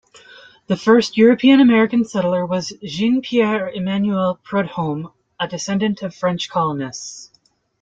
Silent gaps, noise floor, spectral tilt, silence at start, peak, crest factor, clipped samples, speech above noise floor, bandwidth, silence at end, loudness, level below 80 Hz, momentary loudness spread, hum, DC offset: none; -60 dBFS; -5.5 dB/octave; 0.7 s; -2 dBFS; 16 dB; under 0.1%; 43 dB; 7.8 kHz; 0.55 s; -18 LUFS; -60 dBFS; 15 LU; none; under 0.1%